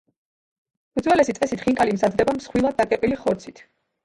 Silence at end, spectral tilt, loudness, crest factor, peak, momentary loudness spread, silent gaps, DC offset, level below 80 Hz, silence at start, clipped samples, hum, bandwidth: 0.55 s; -5.5 dB/octave; -22 LUFS; 18 dB; -4 dBFS; 7 LU; none; under 0.1%; -52 dBFS; 0.95 s; under 0.1%; none; 11.5 kHz